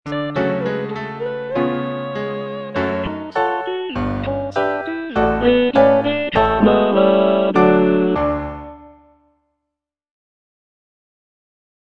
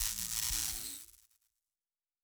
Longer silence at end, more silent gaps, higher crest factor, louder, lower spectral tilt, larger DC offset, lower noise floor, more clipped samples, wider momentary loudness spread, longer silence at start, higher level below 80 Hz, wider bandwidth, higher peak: first, 3 s vs 1.2 s; neither; second, 18 dB vs 26 dB; first, -18 LUFS vs -35 LUFS; first, -8 dB/octave vs 0.5 dB/octave; neither; second, -81 dBFS vs under -90 dBFS; neither; second, 12 LU vs 15 LU; about the same, 0.05 s vs 0 s; first, -40 dBFS vs -54 dBFS; second, 6.8 kHz vs over 20 kHz; first, 0 dBFS vs -16 dBFS